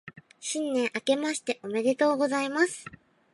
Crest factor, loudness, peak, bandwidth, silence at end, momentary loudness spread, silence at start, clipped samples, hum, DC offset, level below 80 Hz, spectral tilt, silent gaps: 18 dB; -27 LUFS; -10 dBFS; 11.5 kHz; 0.45 s; 10 LU; 0.05 s; under 0.1%; none; under 0.1%; -74 dBFS; -3 dB/octave; none